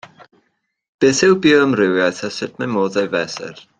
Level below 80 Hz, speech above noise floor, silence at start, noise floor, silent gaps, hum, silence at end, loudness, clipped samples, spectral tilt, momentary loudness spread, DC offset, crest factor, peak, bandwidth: -58 dBFS; 52 dB; 0.2 s; -69 dBFS; 0.88-0.98 s; none; 0.25 s; -16 LUFS; under 0.1%; -4.5 dB/octave; 12 LU; under 0.1%; 16 dB; -2 dBFS; 9.4 kHz